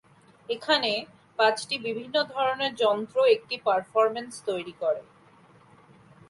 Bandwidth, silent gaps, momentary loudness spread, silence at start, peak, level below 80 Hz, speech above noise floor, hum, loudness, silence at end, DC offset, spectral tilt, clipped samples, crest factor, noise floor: 11.5 kHz; none; 10 LU; 0.5 s; -8 dBFS; -76 dBFS; 30 dB; none; -26 LUFS; 1.3 s; under 0.1%; -3 dB/octave; under 0.1%; 20 dB; -56 dBFS